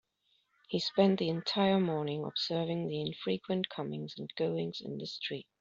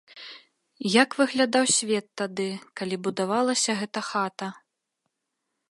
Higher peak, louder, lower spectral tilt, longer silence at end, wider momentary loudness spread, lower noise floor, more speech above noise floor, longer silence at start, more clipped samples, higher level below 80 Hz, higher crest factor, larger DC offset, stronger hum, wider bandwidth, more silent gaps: second, -14 dBFS vs -4 dBFS; second, -33 LUFS vs -25 LUFS; first, -4.5 dB/octave vs -3 dB/octave; second, 0.2 s vs 1.15 s; second, 11 LU vs 15 LU; second, -75 dBFS vs -81 dBFS; second, 42 dB vs 56 dB; first, 0.7 s vs 0.15 s; neither; about the same, -74 dBFS vs -78 dBFS; about the same, 20 dB vs 24 dB; neither; neither; second, 7.6 kHz vs 11.5 kHz; neither